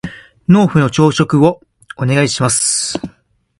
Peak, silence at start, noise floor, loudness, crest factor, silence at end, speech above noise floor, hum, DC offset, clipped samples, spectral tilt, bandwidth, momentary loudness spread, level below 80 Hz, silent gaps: 0 dBFS; 0.05 s; -53 dBFS; -13 LUFS; 14 dB; 0.5 s; 41 dB; none; under 0.1%; under 0.1%; -5 dB/octave; 11.5 kHz; 14 LU; -46 dBFS; none